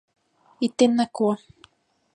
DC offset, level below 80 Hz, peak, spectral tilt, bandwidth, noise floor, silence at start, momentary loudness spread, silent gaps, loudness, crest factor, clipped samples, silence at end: under 0.1%; -70 dBFS; -6 dBFS; -5 dB/octave; 10 kHz; -58 dBFS; 0.6 s; 9 LU; none; -23 LUFS; 20 dB; under 0.1%; 0.8 s